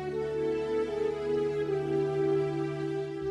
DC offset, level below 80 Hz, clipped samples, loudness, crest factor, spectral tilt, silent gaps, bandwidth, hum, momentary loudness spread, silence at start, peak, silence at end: under 0.1%; -58 dBFS; under 0.1%; -31 LUFS; 12 dB; -7.5 dB/octave; none; 10 kHz; none; 5 LU; 0 s; -20 dBFS; 0 s